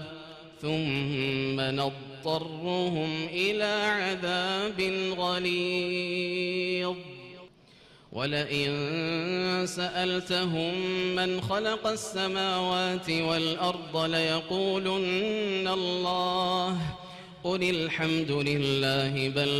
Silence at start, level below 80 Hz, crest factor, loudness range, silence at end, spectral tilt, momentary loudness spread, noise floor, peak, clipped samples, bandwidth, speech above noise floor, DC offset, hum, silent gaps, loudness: 0 s; -62 dBFS; 14 dB; 3 LU; 0 s; -5 dB/octave; 6 LU; -56 dBFS; -16 dBFS; under 0.1%; 15 kHz; 27 dB; under 0.1%; none; none; -28 LUFS